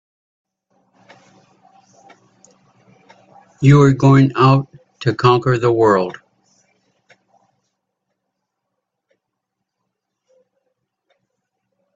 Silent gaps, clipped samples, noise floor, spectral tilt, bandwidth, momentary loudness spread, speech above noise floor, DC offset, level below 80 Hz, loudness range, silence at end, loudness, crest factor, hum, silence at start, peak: none; under 0.1%; -78 dBFS; -8 dB/octave; 7.6 kHz; 12 LU; 66 dB; under 0.1%; -54 dBFS; 8 LU; 5.85 s; -14 LUFS; 20 dB; none; 3.6 s; 0 dBFS